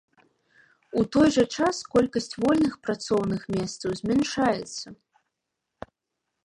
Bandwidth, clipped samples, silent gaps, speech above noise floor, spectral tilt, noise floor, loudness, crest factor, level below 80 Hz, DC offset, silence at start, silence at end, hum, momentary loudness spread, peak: 11.5 kHz; under 0.1%; none; 58 dB; -5 dB/octave; -83 dBFS; -25 LUFS; 18 dB; -56 dBFS; under 0.1%; 0.95 s; 1.55 s; none; 18 LU; -8 dBFS